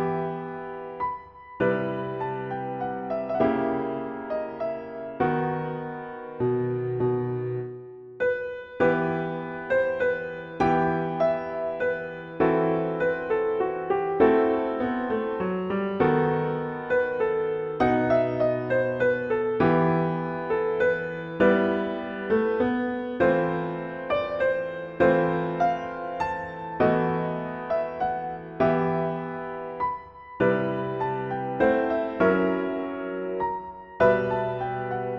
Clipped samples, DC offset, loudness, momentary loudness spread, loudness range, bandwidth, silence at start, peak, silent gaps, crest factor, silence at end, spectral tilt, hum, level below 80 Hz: under 0.1%; under 0.1%; -26 LUFS; 10 LU; 4 LU; 6.8 kHz; 0 s; -8 dBFS; none; 18 dB; 0 s; -9 dB/octave; none; -56 dBFS